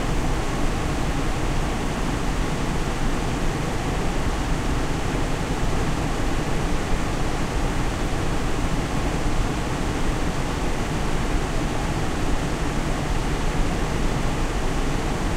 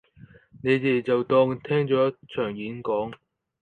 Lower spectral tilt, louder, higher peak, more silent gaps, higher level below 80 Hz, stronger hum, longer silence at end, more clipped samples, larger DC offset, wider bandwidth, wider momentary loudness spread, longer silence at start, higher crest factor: second, -5 dB/octave vs -8.5 dB/octave; about the same, -26 LUFS vs -25 LUFS; about the same, -8 dBFS vs -8 dBFS; neither; first, -26 dBFS vs -62 dBFS; neither; second, 0 s vs 0.45 s; neither; neither; first, 14.5 kHz vs 4.6 kHz; second, 1 LU vs 9 LU; second, 0 s vs 0.55 s; about the same, 14 dB vs 16 dB